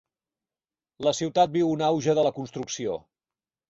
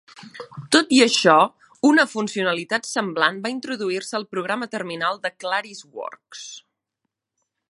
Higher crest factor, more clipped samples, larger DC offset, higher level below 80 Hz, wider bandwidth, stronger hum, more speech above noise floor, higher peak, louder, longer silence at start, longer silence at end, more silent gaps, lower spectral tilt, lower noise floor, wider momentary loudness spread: about the same, 18 dB vs 22 dB; neither; neither; first, -66 dBFS vs -76 dBFS; second, 8 kHz vs 11.5 kHz; neither; first, over 65 dB vs 59 dB; second, -8 dBFS vs 0 dBFS; second, -25 LUFS vs -20 LUFS; first, 1 s vs 0.15 s; second, 0.7 s vs 1.1 s; neither; first, -5 dB/octave vs -3 dB/octave; first, under -90 dBFS vs -81 dBFS; second, 10 LU vs 21 LU